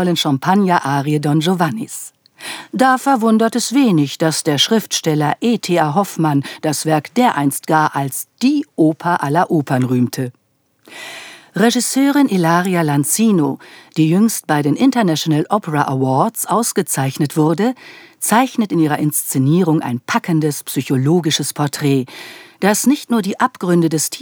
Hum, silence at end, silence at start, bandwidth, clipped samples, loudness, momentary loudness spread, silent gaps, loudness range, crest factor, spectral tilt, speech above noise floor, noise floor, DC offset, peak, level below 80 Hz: none; 0 s; 0 s; over 20 kHz; under 0.1%; -16 LUFS; 8 LU; none; 2 LU; 16 dB; -5 dB/octave; 43 dB; -59 dBFS; under 0.1%; 0 dBFS; -78 dBFS